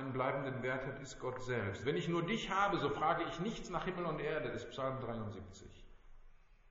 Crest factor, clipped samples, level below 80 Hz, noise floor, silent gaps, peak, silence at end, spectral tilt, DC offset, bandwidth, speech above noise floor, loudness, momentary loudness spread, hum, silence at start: 20 dB; under 0.1%; -58 dBFS; -60 dBFS; none; -20 dBFS; 0.15 s; -4.5 dB/octave; under 0.1%; 7.6 kHz; 21 dB; -39 LUFS; 10 LU; none; 0 s